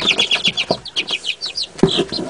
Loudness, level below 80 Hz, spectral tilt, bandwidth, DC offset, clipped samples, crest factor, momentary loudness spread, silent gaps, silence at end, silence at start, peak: -17 LUFS; -46 dBFS; -3 dB/octave; 10.5 kHz; 0.2%; under 0.1%; 20 dB; 8 LU; none; 0 s; 0 s; 0 dBFS